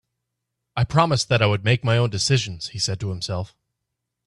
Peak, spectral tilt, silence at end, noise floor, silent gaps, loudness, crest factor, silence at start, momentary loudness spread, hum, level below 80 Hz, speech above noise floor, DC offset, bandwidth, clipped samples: -4 dBFS; -4.5 dB/octave; 0.8 s; -81 dBFS; none; -21 LUFS; 20 dB; 0.75 s; 10 LU; none; -50 dBFS; 59 dB; under 0.1%; 11.5 kHz; under 0.1%